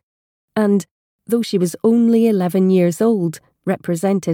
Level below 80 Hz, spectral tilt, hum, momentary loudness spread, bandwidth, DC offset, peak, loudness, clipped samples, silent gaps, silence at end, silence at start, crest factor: -66 dBFS; -7 dB/octave; none; 10 LU; 17 kHz; under 0.1%; -4 dBFS; -17 LUFS; under 0.1%; 0.91-1.19 s; 0 s; 0.55 s; 12 dB